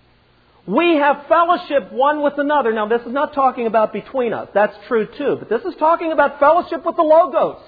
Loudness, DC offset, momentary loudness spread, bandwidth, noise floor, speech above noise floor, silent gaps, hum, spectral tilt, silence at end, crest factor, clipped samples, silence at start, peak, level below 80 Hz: -17 LUFS; under 0.1%; 8 LU; 5 kHz; -54 dBFS; 37 dB; none; none; -8.5 dB/octave; 0.1 s; 16 dB; under 0.1%; 0.65 s; -2 dBFS; -58 dBFS